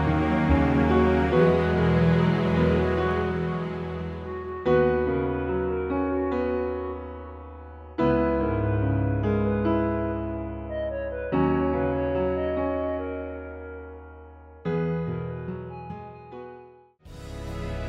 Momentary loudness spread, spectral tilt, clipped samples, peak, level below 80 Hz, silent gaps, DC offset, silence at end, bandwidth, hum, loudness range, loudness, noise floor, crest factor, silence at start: 18 LU; -9 dB/octave; under 0.1%; -8 dBFS; -38 dBFS; none; under 0.1%; 0 s; 7.6 kHz; none; 11 LU; -25 LUFS; -50 dBFS; 18 dB; 0 s